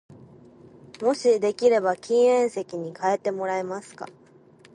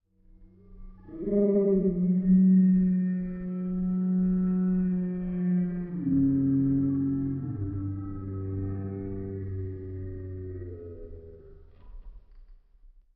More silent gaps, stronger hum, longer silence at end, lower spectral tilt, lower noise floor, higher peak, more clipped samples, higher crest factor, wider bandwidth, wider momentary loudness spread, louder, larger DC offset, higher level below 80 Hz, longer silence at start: neither; neither; first, 0.65 s vs 0.3 s; second, -4.5 dB/octave vs -14 dB/octave; about the same, -53 dBFS vs -55 dBFS; first, -6 dBFS vs -14 dBFS; neither; about the same, 18 dB vs 14 dB; first, 10.5 kHz vs 2.4 kHz; about the same, 15 LU vs 16 LU; first, -23 LUFS vs -27 LUFS; neither; second, -72 dBFS vs -48 dBFS; second, 0.1 s vs 0.4 s